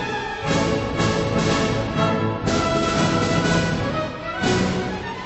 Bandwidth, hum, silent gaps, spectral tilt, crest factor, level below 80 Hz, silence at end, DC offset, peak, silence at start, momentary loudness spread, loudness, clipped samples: 8.4 kHz; none; none; -5 dB/octave; 14 dB; -40 dBFS; 0 s; under 0.1%; -6 dBFS; 0 s; 6 LU; -21 LUFS; under 0.1%